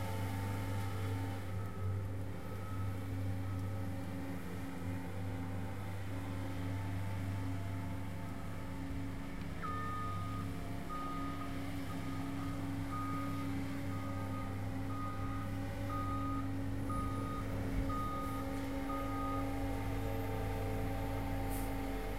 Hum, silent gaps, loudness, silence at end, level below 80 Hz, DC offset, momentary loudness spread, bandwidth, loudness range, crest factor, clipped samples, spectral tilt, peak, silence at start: none; none; -41 LUFS; 0 s; -48 dBFS; 0.5%; 4 LU; 16 kHz; 3 LU; 14 dB; under 0.1%; -7 dB/octave; -26 dBFS; 0 s